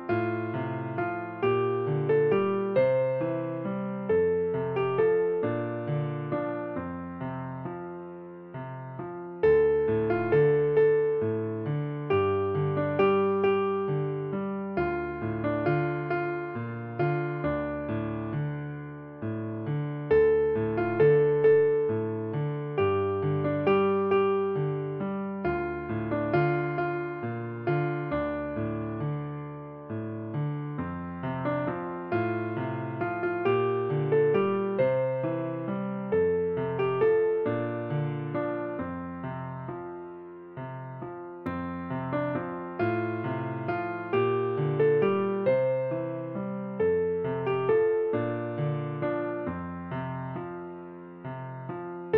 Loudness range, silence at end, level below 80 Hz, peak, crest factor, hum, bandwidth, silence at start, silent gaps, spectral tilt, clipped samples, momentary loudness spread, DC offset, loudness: 8 LU; 0 s; -58 dBFS; -12 dBFS; 16 dB; none; 4.9 kHz; 0 s; none; -7.5 dB/octave; under 0.1%; 14 LU; under 0.1%; -28 LUFS